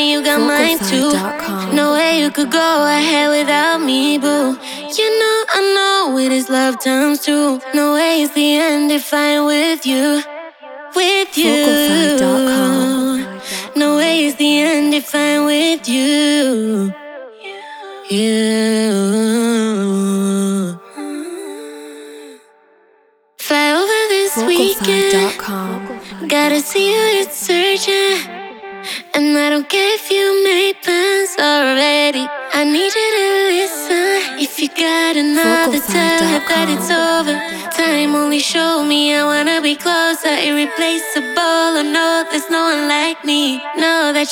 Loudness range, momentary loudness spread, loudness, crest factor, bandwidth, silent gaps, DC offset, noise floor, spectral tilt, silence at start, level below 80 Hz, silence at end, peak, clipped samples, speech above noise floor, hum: 3 LU; 10 LU; -14 LUFS; 14 dB; 19.5 kHz; none; under 0.1%; -54 dBFS; -3 dB/octave; 0 s; -60 dBFS; 0 s; 0 dBFS; under 0.1%; 40 dB; none